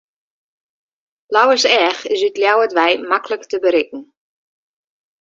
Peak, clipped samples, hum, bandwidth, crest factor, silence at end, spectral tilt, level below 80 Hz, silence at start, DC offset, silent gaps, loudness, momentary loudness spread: 0 dBFS; under 0.1%; none; 7.8 kHz; 18 dB; 1.2 s; -1 dB/octave; -66 dBFS; 1.3 s; under 0.1%; none; -15 LUFS; 7 LU